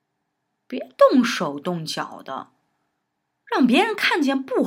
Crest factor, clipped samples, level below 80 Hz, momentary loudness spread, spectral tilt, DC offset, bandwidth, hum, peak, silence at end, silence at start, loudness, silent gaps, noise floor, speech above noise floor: 20 dB; under 0.1%; -82 dBFS; 18 LU; -4.5 dB/octave; under 0.1%; 16 kHz; none; -2 dBFS; 0 s; 0.7 s; -20 LUFS; none; -76 dBFS; 56 dB